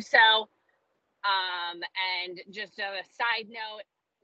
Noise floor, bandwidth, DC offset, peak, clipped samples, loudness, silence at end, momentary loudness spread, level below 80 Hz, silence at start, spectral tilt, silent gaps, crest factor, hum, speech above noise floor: -75 dBFS; 8 kHz; under 0.1%; -8 dBFS; under 0.1%; -27 LUFS; 0.4 s; 18 LU; under -90 dBFS; 0 s; -1 dB/octave; none; 22 dB; none; 47 dB